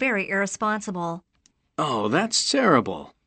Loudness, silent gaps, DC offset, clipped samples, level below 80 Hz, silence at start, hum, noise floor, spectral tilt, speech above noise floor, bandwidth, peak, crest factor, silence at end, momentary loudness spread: -23 LUFS; none; under 0.1%; under 0.1%; -64 dBFS; 0 s; none; -66 dBFS; -3.5 dB/octave; 42 dB; 8.8 kHz; -4 dBFS; 20 dB; 0.2 s; 13 LU